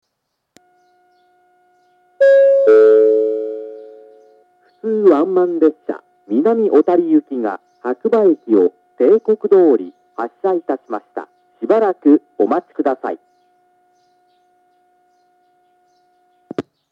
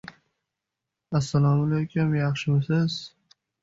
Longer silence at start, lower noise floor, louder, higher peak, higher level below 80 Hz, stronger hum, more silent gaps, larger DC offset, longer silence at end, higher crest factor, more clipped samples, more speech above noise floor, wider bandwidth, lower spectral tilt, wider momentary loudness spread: first, 2.2 s vs 1.1 s; second, -74 dBFS vs -85 dBFS; first, -15 LUFS vs -25 LUFS; first, 0 dBFS vs -12 dBFS; second, -80 dBFS vs -56 dBFS; neither; neither; neither; second, 0.3 s vs 0.55 s; about the same, 16 dB vs 14 dB; neither; about the same, 59 dB vs 62 dB; second, 5.2 kHz vs 7.8 kHz; about the same, -8 dB/octave vs -7 dB/octave; first, 18 LU vs 7 LU